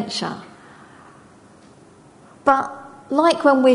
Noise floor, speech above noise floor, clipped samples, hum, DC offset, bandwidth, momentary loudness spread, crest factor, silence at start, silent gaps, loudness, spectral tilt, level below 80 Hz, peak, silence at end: -48 dBFS; 31 dB; under 0.1%; none; under 0.1%; 11 kHz; 18 LU; 20 dB; 0 s; none; -19 LUFS; -4.5 dB/octave; -64 dBFS; 0 dBFS; 0 s